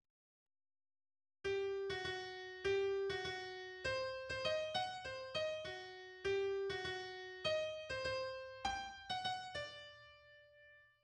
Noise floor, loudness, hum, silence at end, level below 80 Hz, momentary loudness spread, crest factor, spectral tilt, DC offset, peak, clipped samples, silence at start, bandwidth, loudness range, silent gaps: -66 dBFS; -42 LUFS; none; 0.2 s; -68 dBFS; 10 LU; 16 dB; -3.5 dB/octave; under 0.1%; -26 dBFS; under 0.1%; 1.45 s; 10.5 kHz; 2 LU; none